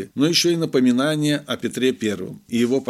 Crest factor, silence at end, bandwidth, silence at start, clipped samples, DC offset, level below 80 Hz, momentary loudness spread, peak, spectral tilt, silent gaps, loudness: 14 dB; 0.05 s; 15 kHz; 0 s; under 0.1%; under 0.1%; -66 dBFS; 9 LU; -6 dBFS; -4.5 dB/octave; none; -20 LUFS